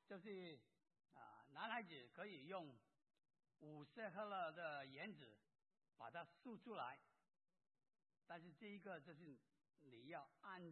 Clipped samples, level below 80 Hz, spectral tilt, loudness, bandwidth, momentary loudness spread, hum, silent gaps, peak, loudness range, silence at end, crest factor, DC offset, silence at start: under 0.1%; under -90 dBFS; -3 dB/octave; -56 LUFS; 4.2 kHz; 16 LU; none; none; -34 dBFS; 6 LU; 0 s; 24 dB; under 0.1%; 0.1 s